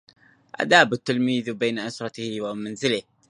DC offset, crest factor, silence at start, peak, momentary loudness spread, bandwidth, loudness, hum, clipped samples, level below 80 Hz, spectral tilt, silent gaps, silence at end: under 0.1%; 24 dB; 0.6 s; 0 dBFS; 14 LU; 11 kHz; -23 LUFS; none; under 0.1%; -68 dBFS; -4 dB/octave; none; 0.3 s